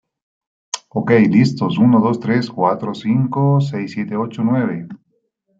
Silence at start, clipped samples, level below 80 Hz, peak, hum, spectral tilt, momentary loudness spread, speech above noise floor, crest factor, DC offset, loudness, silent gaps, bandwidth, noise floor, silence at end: 0.75 s; under 0.1%; -60 dBFS; -2 dBFS; none; -7 dB/octave; 11 LU; 51 dB; 16 dB; under 0.1%; -17 LUFS; none; 7.8 kHz; -66 dBFS; 0.65 s